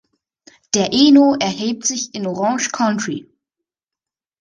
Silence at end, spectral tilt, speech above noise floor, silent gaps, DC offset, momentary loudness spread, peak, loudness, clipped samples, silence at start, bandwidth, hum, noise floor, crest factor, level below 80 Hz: 1.2 s; -3.5 dB/octave; 72 dB; none; under 0.1%; 12 LU; -2 dBFS; -16 LUFS; under 0.1%; 0.75 s; 10 kHz; none; -88 dBFS; 18 dB; -60 dBFS